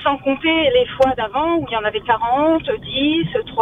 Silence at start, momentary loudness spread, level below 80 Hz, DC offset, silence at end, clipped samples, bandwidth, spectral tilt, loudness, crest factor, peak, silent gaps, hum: 0 s; 5 LU; -44 dBFS; under 0.1%; 0 s; under 0.1%; 9 kHz; -6.5 dB/octave; -18 LUFS; 16 dB; -2 dBFS; none; none